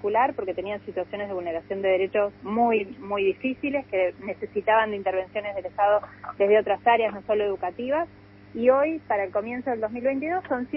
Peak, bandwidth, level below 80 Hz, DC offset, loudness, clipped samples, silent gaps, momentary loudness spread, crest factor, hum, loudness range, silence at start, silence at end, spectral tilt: -6 dBFS; 5.6 kHz; -60 dBFS; under 0.1%; -25 LUFS; under 0.1%; none; 10 LU; 18 dB; none; 2 LU; 0 s; 0 s; -3.5 dB/octave